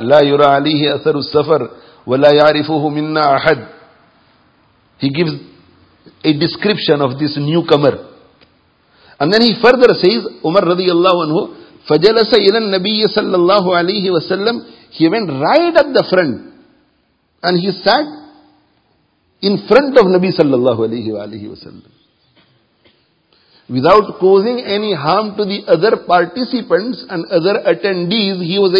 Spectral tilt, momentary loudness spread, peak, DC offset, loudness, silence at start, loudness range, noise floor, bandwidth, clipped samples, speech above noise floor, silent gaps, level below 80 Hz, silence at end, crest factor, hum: -7.5 dB/octave; 10 LU; 0 dBFS; under 0.1%; -13 LUFS; 0 s; 6 LU; -59 dBFS; 8 kHz; 0.2%; 47 dB; none; -54 dBFS; 0 s; 14 dB; none